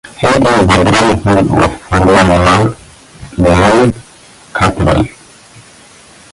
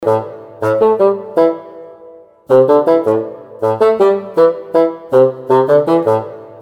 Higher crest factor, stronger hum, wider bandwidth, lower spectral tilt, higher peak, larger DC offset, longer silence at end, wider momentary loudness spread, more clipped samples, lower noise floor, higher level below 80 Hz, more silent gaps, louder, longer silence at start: about the same, 10 dB vs 12 dB; neither; about the same, 11.5 kHz vs 11.5 kHz; second, -5.5 dB/octave vs -8 dB/octave; about the same, 0 dBFS vs 0 dBFS; neither; first, 1.25 s vs 0 s; about the same, 10 LU vs 8 LU; neither; about the same, -39 dBFS vs -39 dBFS; first, -26 dBFS vs -62 dBFS; neither; first, -10 LUFS vs -13 LUFS; about the same, 0.05 s vs 0 s